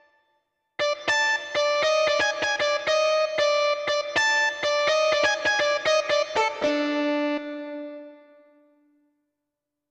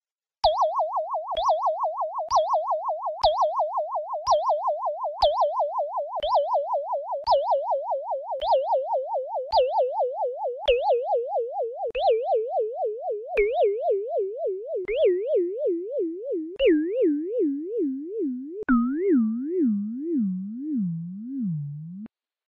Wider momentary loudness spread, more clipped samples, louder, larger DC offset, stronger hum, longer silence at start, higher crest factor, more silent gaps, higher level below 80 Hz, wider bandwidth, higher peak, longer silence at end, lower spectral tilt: about the same, 9 LU vs 8 LU; neither; about the same, -23 LUFS vs -25 LUFS; neither; neither; first, 0.8 s vs 0.45 s; about the same, 16 dB vs 16 dB; neither; second, -66 dBFS vs -54 dBFS; first, 9.4 kHz vs 6.6 kHz; about the same, -8 dBFS vs -10 dBFS; first, 1.75 s vs 0.4 s; second, -1.5 dB/octave vs -6.5 dB/octave